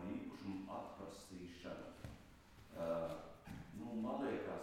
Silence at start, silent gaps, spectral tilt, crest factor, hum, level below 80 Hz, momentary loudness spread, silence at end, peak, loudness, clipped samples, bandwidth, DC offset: 0 s; none; -6.5 dB/octave; 16 dB; none; -68 dBFS; 14 LU; 0 s; -32 dBFS; -48 LUFS; under 0.1%; 16.5 kHz; under 0.1%